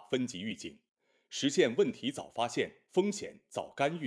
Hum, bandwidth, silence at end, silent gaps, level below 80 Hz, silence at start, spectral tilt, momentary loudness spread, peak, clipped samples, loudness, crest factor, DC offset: none; 11 kHz; 0 s; none; -76 dBFS; 0 s; -4 dB/octave; 13 LU; -14 dBFS; under 0.1%; -34 LUFS; 20 dB; under 0.1%